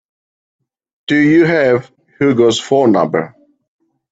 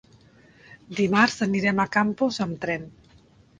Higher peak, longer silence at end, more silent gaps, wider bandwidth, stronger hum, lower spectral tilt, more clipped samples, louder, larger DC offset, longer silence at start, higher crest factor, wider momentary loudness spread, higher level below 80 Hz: first, 0 dBFS vs -4 dBFS; first, 0.85 s vs 0.7 s; neither; second, 8 kHz vs 9.4 kHz; neither; about the same, -5.5 dB/octave vs -5.5 dB/octave; neither; first, -13 LUFS vs -24 LUFS; neither; first, 1.1 s vs 0.7 s; second, 14 dB vs 22 dB; second, 9 LU vs 12 LU; about the same, -58 dBFS vs -60 dBFS